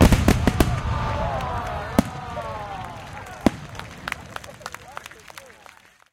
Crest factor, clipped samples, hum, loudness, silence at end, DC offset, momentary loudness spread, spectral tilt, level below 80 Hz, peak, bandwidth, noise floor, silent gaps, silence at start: 24 dB; under 0.1%; none; -25 LUFS; 0.65 s; under 0.1%; 19 LU; -6 dB/octave; -30 dBFS; 0 dBFS; 17 kHz; -50 dBFS; none; 0 s